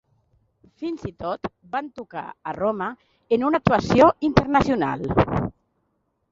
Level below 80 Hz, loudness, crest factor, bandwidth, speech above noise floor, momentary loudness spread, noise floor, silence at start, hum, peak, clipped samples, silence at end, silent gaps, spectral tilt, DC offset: -44 dBFS; -22 LUFS; 22 dB; 7.8 kHz; 50 dB; 17 LU; -72 dBFS; 0.8 s; none; -2 dBFS; under 0.1%; 0.8 s; none; -7.5 dB/octave; under 0.1%